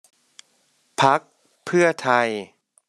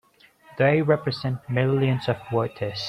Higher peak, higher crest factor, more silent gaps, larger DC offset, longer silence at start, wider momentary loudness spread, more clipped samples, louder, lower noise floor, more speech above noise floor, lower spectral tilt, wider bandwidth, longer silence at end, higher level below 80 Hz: about the same, -4 dBFS vs -6 dBFS; about the same, 20 dB vs 18 dB; neither; neither; first, 1 s vs 0.5 s; first, 14 LU vs 8 LU; neither; first, -20 LUFS vs -24 LUFS; first, -65 dBFS vs -55 dBFS; first, 45 dB vs 31 dB; second, -4.5 dB/octave vs -7.5 dB/octave; first, 12.5 kHz vs 7.6 kHz; first, 0.45 s vs 0 s; second, -72 dBFS vs -60 dBFS